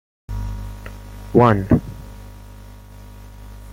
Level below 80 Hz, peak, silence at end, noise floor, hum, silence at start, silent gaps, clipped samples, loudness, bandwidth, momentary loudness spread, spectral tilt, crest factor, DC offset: -34 dBFS; -2 dBFS; 0 s; -39 dBFS; 50 Hz at -35 dBFS; 0.3 s; none; under 0.1%; -18 LUFS; 16.5 kHz; 27 LU; -8.5 dB/octave; 20 dB; under 0.1%